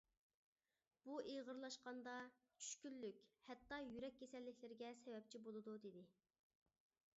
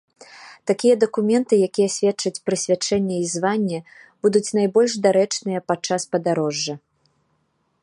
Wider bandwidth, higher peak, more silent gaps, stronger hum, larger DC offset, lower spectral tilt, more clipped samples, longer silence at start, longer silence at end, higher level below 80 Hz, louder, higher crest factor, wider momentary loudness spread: second, 7.6 kHz vs 11.5 kHz; second, -38 dBFS vs -4 dBFS; neither; neither; neither; second, -3 dB/octave vs -4.5 dB/octave; neither; first, 1.05 s vs 0.35 s; about the same, 1.05 s vs 1.05 s; second, -88 dBFS vs -66 dBFS; second, -56 LUFS vs -21 LUFS; about the same, 20 dB vs 18 dB; about the same, 9 LU vs 7 LU